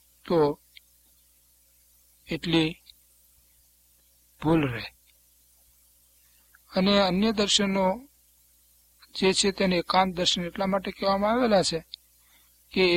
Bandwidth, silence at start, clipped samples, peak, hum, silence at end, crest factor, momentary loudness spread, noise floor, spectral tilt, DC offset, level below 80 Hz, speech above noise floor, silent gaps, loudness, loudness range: 16.5 kHz; 0.25 s; under 0.1%; -6 dBFS; 60 Hz at -50 dBFS; 0 s; 22 dB; 14 LU; -62 dBFS; -4.5 dB/octave; under 0.1%; -54 dBFS; 38 dB; none; -25 LUFS; 9 LU